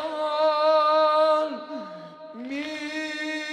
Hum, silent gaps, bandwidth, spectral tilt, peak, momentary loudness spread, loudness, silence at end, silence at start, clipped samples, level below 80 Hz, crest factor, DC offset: none; none; 10 kHz; -3 dB/octave; -10 dBFS; 19 LU; -23 LUFS; 0 s; 0 s; under 0.1%; -78 dBFS; 14 dB; under 0.1%